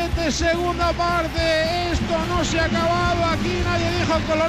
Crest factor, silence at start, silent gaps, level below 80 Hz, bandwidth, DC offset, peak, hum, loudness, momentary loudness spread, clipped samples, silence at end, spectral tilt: 10 dB; 0 s; none; -32 dBFS; 15.5 kHz; under 0.1%; -10 dBFS; none; -21 LUFS; 2 LU; under 0.1%; 0 s; -5 dB/octave